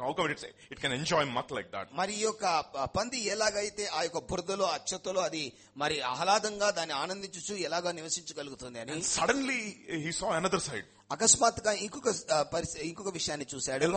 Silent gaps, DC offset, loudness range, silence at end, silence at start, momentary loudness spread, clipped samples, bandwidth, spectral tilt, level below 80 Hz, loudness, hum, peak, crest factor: none; under 0.1%; 3 LU; 0 s; 0 s; 10 LU; under 0.1%; 8.8 kHz; -2.5 dB/octave; -60 dBFS; -31 LUFS; none; -8 dBFS; 24 dB